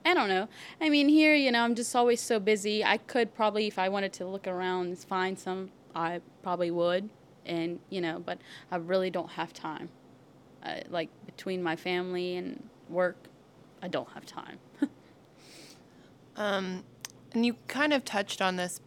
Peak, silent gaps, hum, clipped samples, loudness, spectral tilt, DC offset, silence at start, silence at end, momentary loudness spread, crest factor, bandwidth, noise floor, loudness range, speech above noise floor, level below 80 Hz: -8 dBFS; none; none; under 0.1%; -30 LUFS; -4 dB/octave; under 0.1%; 0.05 s; 0.1 s; 17 LU; 22 dB; 16 kHz; -57 dBFS; 12 LU; 27 dB; -78 dBFS